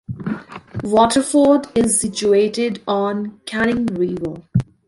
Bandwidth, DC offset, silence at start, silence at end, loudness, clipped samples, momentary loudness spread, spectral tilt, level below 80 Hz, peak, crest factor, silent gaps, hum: 11.5 kHz; under 0.1%; 0.1 s; 0.25 s; -18 LUFS; under 0.1%; 13 LU; -5 dB/octave; -48 dBFS; -2 dBFS; 16 dB; none; none